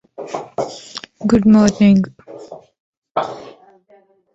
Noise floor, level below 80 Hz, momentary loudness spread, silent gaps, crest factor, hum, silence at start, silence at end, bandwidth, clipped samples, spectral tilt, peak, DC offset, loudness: -53 dBFS; -46 dBFS; 25 LU; 2.80-3.02 s, 3.11-3.15 s; 18 dB; none; 0.2 s; 0.85 s; 8 kHz; under 0.1%; -6.5 dB/octave; 0 dBFS; under 0.1%; -16 LUFS